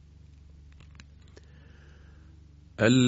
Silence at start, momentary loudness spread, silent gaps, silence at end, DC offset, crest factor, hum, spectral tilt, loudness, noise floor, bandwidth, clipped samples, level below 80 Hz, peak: 2.8 s; 21 LU; none; 0 s; under 0.1%; 24 dB; none; -5.5 dB/octave; -25 LUFS; -52 dBFS; 8 kHz; under 0.1%; -54 dBFS; -8 dBFS